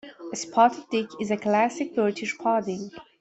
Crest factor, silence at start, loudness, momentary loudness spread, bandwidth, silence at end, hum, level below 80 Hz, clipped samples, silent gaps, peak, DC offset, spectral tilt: 20 dB; 0.05 s; -25 LUFS; 13 LU; 8.2 kHz; 0.2 s; none; -70 dBFS; under 0.1%; none; -6 dBFS; under 0.1%; -4.5 dB/octave